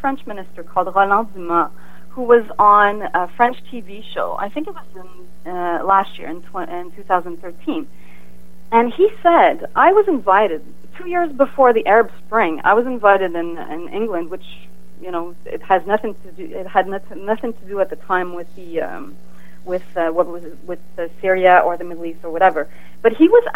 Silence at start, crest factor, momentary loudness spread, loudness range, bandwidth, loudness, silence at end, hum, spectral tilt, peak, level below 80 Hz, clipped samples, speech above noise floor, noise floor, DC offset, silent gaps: 0.05 s; 18 dB; 19 LU; 8 LU; 16 kHz; -17 LUFS; 0.05 s; none; -6.5 dB/octave; 0 dBFS; -54 dBFS; under 0.1%; 28 dB; -46 dBFS; 5%; none